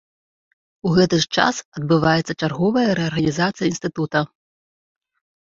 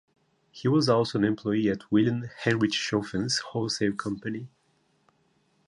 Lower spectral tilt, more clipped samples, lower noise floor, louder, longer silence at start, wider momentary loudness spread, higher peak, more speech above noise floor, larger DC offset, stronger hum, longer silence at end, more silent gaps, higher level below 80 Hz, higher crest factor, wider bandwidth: about the same, -5.5 dB/octave vs -5 dB/octave; neither; first, under -90 dBFS vs -69 dBFS; first, -20 LUFS vs -27 LUFS; first, 0.85 s vs 0.55 s; about the same, 8 LU vs 9 LU; first, -2 dBFS vs -10 dBFS; first, over 71 dB vs 42 dB; neither; neither; about the same, 1.15 s vs 1.2 s; first, 1.65-1.72 s vs none; first, -52 dBFS vs -62 dBFS; about the same, 20 dB vs 18 dB; second, 7.8 kHz vs 11 kHz